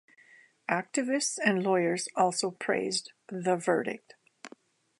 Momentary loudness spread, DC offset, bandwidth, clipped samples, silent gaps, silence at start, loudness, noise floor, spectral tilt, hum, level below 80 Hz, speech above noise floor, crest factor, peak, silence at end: 16 LU; under 0.1%; 11.5 kHz; under 0.1%; none; 0.7 s; -29 LUFS; -59 dBFS; -3.5 dB/octave; none; -82 dBFS; 30 dB; 22 dB; -8 dBFS; 0.5 s